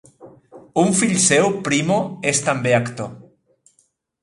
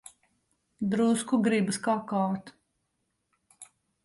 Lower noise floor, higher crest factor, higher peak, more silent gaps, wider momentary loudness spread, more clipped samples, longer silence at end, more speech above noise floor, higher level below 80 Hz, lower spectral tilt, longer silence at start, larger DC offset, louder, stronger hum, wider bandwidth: second, -64 dBFS vs -79 dBFS; about the same, 18 dB vs 16 dB; first, -2 dBFS vs -14 dBFS; neither; first, 12 LU vs 7 LU; neither; first, 1.05 s vs 0.4 s; second, 46 dB vs 52 dB; first, -60 dBFS vs -72 dBFS; second, -4 dB/octave vs -5.5 dB/octave; second, 0.2 s vs 0.8 s; neither; first, -18 LUFS vs -28 LUFS; neither; about the same, 11.5 kHz vs 11.5 kHz